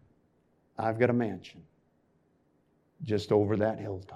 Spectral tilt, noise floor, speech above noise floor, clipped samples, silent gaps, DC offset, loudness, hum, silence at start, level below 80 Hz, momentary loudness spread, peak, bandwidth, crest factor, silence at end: -8 dB/octave; -70 dBFS; 40 dB; under 0.1%; none; under 0.1%; -29 LUFS; none; 0.8 s; -70 dBFS; 17 LU; -10 dBFS; 10.5 kHz; 22 dB; 0 s